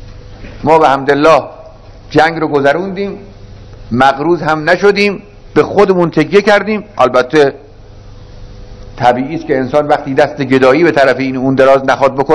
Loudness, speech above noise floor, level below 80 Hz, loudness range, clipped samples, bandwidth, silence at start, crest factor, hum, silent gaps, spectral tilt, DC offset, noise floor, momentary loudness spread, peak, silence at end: -11 LUFS; 24 dB; -36 dBFS; 4 LU; 2%; 11 kHz; 0 s; 12 dB; none; none; -6 dB/octave; under 0.1%; -33 dBFS; 8 LU; 0 dBFS; 0 s